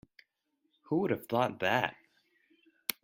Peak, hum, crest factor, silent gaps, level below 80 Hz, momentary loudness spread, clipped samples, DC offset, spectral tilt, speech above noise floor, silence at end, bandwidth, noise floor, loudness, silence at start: -8 dBFS; none; 26 dB; none; -74 dBFS; 8 LU; under 0.1%; under 0.1%; -5 dB/octave; 49 dB; 0.1 s; 16 kHz; -80 dBFS; -32 LUFS; 0.9 s